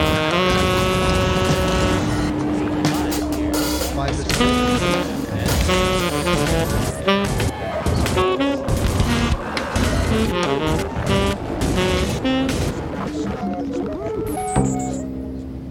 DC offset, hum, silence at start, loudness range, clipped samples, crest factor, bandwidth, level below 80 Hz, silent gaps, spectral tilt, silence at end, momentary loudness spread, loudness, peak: under 0.1%; none; 0 s; 3 LU; under 0.1%; 18 dB; 19 kHz; -30 dBFS; none; -5 dB/octave; 0 s; 7 LU; -20 LUFS; -2 dBFS